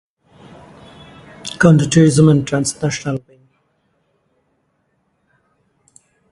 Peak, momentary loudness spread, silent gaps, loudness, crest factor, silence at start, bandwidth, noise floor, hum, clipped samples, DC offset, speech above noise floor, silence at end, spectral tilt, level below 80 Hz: 0 dBFS; 17 LU; none; -14 LUFS; 18 dB; 1.45 s; 11.5 kHz; -65 dBFS; none; under 0.1%; under 0.1%; 52 dB; 3.15 s; -6 dB/octave; -50 dBFS